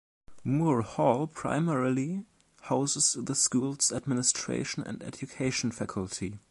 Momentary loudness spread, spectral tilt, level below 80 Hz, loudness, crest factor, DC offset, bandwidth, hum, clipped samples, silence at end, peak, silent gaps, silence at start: 11 LU; -4 dB/octave; -60 dBFS; -29 LUFS; 20 dB; under 0.1%; 11.5 kHz; none; under 0.1%; 0.1 s; -10 dBFS; none; 0.3 s